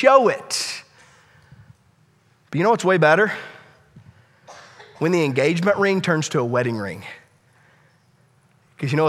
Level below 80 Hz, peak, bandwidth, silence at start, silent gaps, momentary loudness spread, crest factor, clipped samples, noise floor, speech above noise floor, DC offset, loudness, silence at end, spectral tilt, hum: -68 dBFS; 0 dBFS; 15 kHz; 0 s; none; 16 LU; 22 dB; under 0.1%; -59 dBFS; 40 dB; under 0.1%; -20 LUFS; 0 s; -5 dB/octave; none